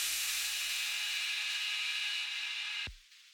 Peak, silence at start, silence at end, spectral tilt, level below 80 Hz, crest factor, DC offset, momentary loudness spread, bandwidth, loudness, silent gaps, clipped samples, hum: -22 dBFS; 0 s; 0 s; 3 dB/octave; -64 dBFS; 16 dB; under 0.1%; 4 LU; 18 kHz; -33 LUFS; none; under 0.1%; none